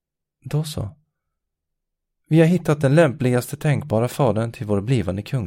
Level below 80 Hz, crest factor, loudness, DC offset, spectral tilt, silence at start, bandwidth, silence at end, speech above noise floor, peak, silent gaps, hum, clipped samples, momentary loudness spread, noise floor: -52 dBFS; 18 dB; -20 LUFS; under 0.1%; -7 dB/octave; 0.45 s; 16.5 kHz; 0 s; 60 dB; -2 dBFS; none; none; under 0.1%; 10 LU; -79 dBFS